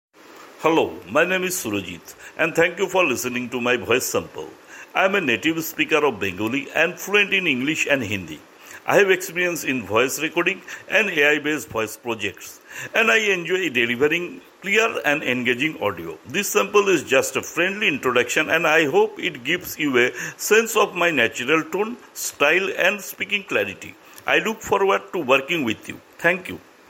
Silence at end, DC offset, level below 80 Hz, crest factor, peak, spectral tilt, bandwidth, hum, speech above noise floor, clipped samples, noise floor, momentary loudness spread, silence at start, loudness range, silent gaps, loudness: 0.3 s; under 0.1%; -64 dBFS; 18 dB; -2 dBFS; -3 dB/octave; 16.5 kHz; none; 24 dB; under 0.1%; -45 dBFS; 11 LU; 0.3 s; 3 LU; none; -20 LUFS